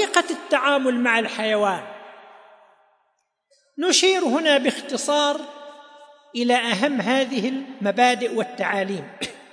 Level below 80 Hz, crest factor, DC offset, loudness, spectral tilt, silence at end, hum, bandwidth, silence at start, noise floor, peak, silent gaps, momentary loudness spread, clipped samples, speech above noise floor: -74 dBFS; 20 dB; under 0.1%; -21 LUFS; -2.5 dB/octave; 0.1 s; none; 10.5 kHz; 0 s; -71 dBFS; -2 dBFS; none; 13 LU; under 0.1%; 50 dB